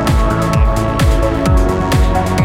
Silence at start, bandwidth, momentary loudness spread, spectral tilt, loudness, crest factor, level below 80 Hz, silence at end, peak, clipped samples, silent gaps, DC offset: 0 s; 16 kHz; 1 LU; -6.5 dB/octave; -14 LUFS; 10 dB; -16 dBFS; 0 s; -2 dBFS; under 0.1%; none; under 0.1%